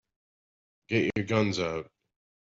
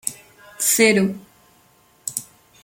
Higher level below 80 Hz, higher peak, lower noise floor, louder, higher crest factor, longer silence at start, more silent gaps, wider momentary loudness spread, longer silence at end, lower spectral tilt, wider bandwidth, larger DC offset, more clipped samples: about the same, -64 dBFS vs -66 dBFS; second, -12 dBFS vs -2 dBFS; first, under -90 dBFS vs -56 dBFS; second, -29 LUFS vs -19 LUFS; about the same, 20 dB vs 22 dB; first, 0.9 s vs 0.05 s; neither; second, 10 LU vs 17 LU; first, 0.55 s vs 0.4 s; first, -6 dB/octave vs -3 dB/octave; second, 7.8 kHz vs 17 kHz; neither; neither